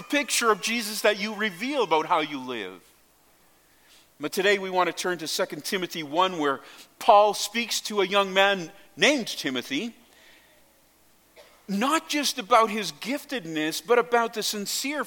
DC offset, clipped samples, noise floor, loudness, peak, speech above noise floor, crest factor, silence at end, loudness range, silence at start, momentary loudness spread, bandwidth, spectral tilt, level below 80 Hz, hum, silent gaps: under 0.1%; under 0.1%; -61 dBFS; -25 LUFS; -4 dBFS; 35 dB; 22 dB; 0 s; 6 LU; 0 s; 10 LU; 17.5 kHz; -2.5 dB/octave; -74 dBFS; none; none